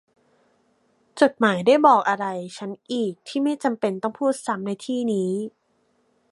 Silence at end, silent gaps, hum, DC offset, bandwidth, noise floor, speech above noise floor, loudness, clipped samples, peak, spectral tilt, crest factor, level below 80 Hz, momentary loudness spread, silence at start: 0.8 s; none; none; under 0.1%; 11.5 kHz; -67 dBFS; 45 dB; -22 LUFS; under 0.1%; -2 dBFS; -5.5 dB/octave; 20 dB; -74 dBFS; 14 LU; 1.15 s